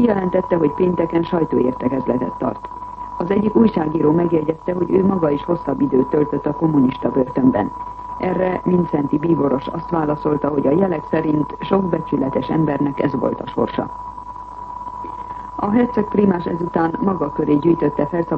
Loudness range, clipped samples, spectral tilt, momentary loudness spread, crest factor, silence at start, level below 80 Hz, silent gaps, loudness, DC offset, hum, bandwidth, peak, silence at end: 4 LU; under 0.1%; -10 dB/octave; 13 LU; 16 dB; 0 s; -44 dBFS; none; -19 LUFS; under 0.1%; none; 5.8 kHz; -2 dBFS; 0 s